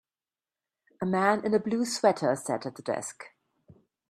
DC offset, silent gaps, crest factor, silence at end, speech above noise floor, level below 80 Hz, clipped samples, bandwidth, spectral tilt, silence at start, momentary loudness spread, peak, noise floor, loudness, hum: under 0.1%; none; 22 dB; 0.8 s; over 62 dB; -74 dBFS; under 0.1%; 14 kHz; -4.5 dB/octave; 1 s; 13 LU; -8 dBFS; under -90 dBFS; -28 LUFS; none